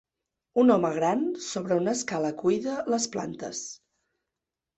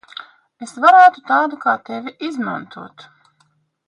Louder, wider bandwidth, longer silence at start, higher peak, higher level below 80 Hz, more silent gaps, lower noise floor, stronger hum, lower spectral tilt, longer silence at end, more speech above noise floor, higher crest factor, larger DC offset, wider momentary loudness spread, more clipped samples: second, -27 LUFS vs -15 LUFS; second, 8.4 kHz vs 10.5 kHz; about the same, 0.55 s vs 0.6 s; second, -8 dBFS vs 0 dBFS; first, -68 dBFS vs -74 dBFS; neither; first, -88 dBFS vs -62 dBFS; neither; about the same, -4.5 dB/octave vs -4.5 dB/octave; about the same, 1 s vs 1 s; first, 61 dB vs 46 dB; about the same, 20 dB vs 18 dB; neither; second, 13 LU vs 26 LU; neither